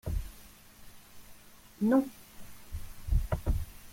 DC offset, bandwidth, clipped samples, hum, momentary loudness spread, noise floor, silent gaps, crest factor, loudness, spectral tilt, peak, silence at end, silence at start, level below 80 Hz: under 0.1%; 16.5 kHz; under 0.1%; none; 27 LU; -54 dBFS; none; 18 dB; -33 LUFS; -7.5 dB/octave; -16 dBFS; 0 s; 0.05 s; -38 dBFS